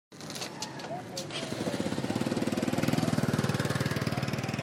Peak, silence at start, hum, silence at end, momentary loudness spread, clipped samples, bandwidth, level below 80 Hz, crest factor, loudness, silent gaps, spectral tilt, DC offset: -12 dBFS; 0.1 s; none; 0 s; 9 LU; under 0.1%; 16 kHz; -62 dBFS; 18 dB; -32 LUFS; none; -5 dB/octave; under 0.1%